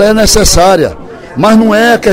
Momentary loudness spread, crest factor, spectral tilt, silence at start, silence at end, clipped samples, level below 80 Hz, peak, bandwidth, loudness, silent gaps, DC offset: 12 LU; 6 dB; -3.5 dB/octave; 0 s; 0 s; 3%; -20 dBFS; 0 dBFS; over 20 kHz; -7 LUFS; none; under 0.1%